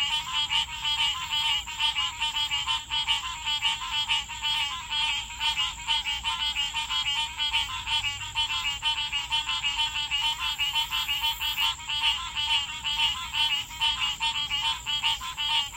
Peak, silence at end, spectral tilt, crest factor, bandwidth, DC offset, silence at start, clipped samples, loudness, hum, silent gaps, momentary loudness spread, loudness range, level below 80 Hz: -10 dBFS; 0 s; 1 dB/octave; 18 dB; 16 kHz; under 0.1%; 0 s; under 0.1%; -26 LUFS; none; none; 2 LU; 1 LU; -50 dBFS